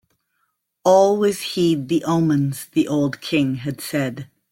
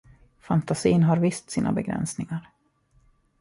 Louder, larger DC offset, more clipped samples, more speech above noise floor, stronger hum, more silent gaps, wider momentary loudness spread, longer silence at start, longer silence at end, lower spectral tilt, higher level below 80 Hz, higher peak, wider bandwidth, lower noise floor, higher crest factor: first, -20 LUFS vs -25 LUFS; neither; neither; first, 52 dB vs 40 dB; neither; neither; about the same, 10 LU vs 12 LU; first, 0.85 s vs 0.5 s; second, 0.25 s vs 1 s; about the same, -6 dB/octave vs -6.5 dB/octave; second, -60 dBFS vs -54 dBFS; first, -2 dBFS vs -8 dBFS; first, 16.5 kHz vs 11.5 kHz; first, -71 dBFS vs -64 dBFS; about the same, 18 dB vs 18 dB